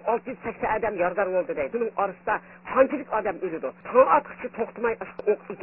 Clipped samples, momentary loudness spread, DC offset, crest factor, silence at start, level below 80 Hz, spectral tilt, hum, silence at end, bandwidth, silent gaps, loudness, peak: under 0.1%; 11 LU; under 0.1%; 20 dB; 0 s; -58 dBFS; -10 dB/octave; none; 0 s; 3.1 kHz; none; -26 LUFS; -6 dBFS